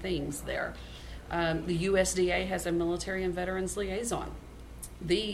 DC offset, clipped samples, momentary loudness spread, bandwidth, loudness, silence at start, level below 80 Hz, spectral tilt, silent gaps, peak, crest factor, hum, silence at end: under 0.1%; under 0.1%; 18 LU; 15.5 kHz; -31 LUFS; 0 s; -46 dBFS; -4.5 dB/octave; none; -14 dBFS; 18 dB; none; 0 s